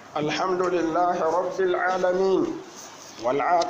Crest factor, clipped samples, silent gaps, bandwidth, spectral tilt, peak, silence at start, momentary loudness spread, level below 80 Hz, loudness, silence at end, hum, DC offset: 14 dB; under 0.1%; none; 15.5 kHz; -5 dB/octave; -10 dBFS; 0 s; 13 LU; -60 dBFS; -24 LUFS; 0 s; none; under 0.1%